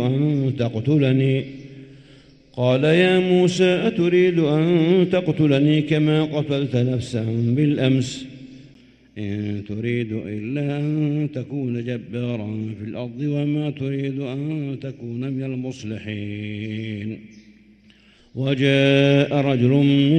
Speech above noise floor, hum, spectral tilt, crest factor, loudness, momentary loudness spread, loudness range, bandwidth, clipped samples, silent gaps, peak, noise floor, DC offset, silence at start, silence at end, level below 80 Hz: 33 dB; none; -7.5 dB/octave; 16 dB; -21 LUFS; 14 LU; 10 LU; 9.2 kHz; under 0.1%; none; -4 dBFS; -52 dBFS; under 0.1%; 0 s; 0 s; -58 dBFS